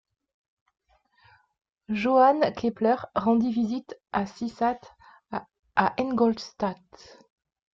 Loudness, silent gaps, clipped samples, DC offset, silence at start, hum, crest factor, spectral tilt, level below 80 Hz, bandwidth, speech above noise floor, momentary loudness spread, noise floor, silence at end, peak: -26 LUFS; 5.59-5.63 s; under 0.1%; under 0.1%; 1.9 s; none; 20 dB; -6.5 dB/octave; -62 dBFS; 7.4 kHz; 37 dB; 17 LU; -62 dBFS; 1 s; -8 dBFS